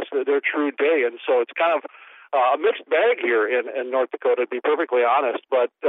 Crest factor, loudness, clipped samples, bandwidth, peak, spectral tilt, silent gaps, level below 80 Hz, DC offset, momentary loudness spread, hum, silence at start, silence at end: 12 dB; -21 LUFS; under 0.1%; 4 kHz; -8 dBFS; -5.5 dB/octave; none; -86 dBFS; under 0.1%; 5 LU; none; 0 s; 0 s